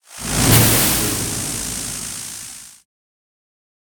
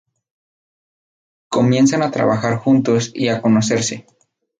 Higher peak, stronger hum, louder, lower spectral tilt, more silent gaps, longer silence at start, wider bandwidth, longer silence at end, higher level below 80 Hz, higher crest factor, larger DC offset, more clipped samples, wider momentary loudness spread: first, 0 dBFS vs -4 dBFS; neither; about the same, -16 LUFS vs -16 LUFS; second, -3 dB/octave vs -5.5 dB/octave; neither; second, 0.1 s vs 1.5 s; first, 19.5 kHz vs 9.4 kHz; first, 1.15 s vs 0.6 s; first, -36 dBFS vs -58 dBFS; first, 20 dB vs 14 dB; neither; neither; first, 18 LU vs 7 LU